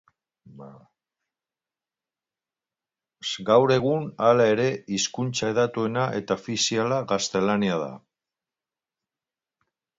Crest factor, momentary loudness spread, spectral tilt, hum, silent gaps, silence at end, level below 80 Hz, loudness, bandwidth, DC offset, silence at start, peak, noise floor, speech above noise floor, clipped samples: 22 dB; 9 LU; -4.5 dB/octave; none; none; 2 s; -66 dBFS; -24 LUFS; 8 kHz; under 0.1%; 0.55 s; -6 dBFS; under -90 dBFS; over 67 dB; under 0.1%